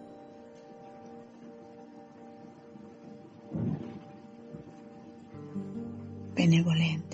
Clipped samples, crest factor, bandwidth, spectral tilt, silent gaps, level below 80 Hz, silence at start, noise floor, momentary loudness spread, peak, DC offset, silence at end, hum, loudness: under 0.1%; 22 dB; 7.8 kHz; -6.5 dB/octave; none; -70 dBFS; 0 s; -50 dBFS; 24 LU; -12 dBFS; under 0.1%; 0 s; none; -31 LUFS